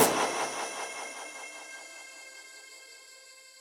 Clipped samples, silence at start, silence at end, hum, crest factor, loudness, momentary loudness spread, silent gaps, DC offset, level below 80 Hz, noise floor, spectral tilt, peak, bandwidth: under 0.1%; 0 s; 0 s; none; 26 dB; -34 LUFS; 19 LU; none; under 0.1%; -74 dBFS; -53 dBFS; -1.5 dB/octave; -8 dBFS; 16 kHz